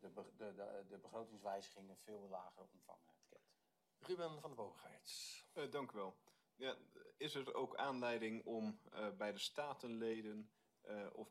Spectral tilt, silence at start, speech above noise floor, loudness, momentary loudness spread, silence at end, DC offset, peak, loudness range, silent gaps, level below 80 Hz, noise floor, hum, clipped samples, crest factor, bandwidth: -4 dB/octave; 0 s; 34 dB; -49 LUFS; 16 LU; 0 s; under 0.1%; -30 dBFS; 8 LU; none; under -90 dBFS; -84 dBFS; none; under 0.1%; 20 dB; 15 kHz